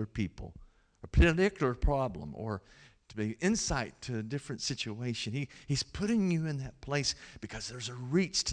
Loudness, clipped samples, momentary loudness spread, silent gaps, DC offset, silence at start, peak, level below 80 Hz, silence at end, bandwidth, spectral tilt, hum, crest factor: -33 LUFS; under 0.1%; 12 LU; none; under 0.1%; 0 s; -16 dBFS; -40 dBFS; 0 s; 10.5 kHz; -4.5 dB/octave; none; 18 dB